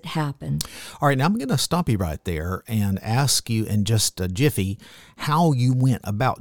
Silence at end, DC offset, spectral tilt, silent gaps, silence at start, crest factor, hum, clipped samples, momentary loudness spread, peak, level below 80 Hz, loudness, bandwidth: 0 s; 0.4%; -5 dB/octave; none; 0 s; 20 dB; none; under 0.1%; 8 LU; -4 dBFS; -44 dBFS; -22 LUFS; 19 kHz